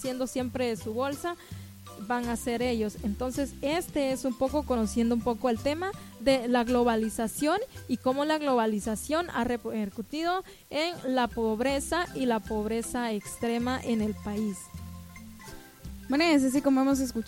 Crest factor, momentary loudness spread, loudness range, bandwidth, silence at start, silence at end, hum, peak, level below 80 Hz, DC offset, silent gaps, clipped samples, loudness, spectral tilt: 18 dB; 16 LU; 4 LU; 17 kHz; 0 s; 0 s; none; -10 dBFS; -50 dBFS; under 0.1%; none; under 0.1%; -29 LUFS; -4.5 dB/octave